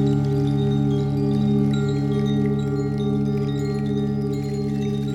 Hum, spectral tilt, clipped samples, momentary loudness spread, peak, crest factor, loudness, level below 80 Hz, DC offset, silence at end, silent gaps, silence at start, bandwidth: none; -8.5 dB/octave; under 0.1%; 4 LU; -8 dBFS; 12 dB; -22 LUFS; -42 dBFS; under 0.1%; 0 s; none; 0 s; 8 kHz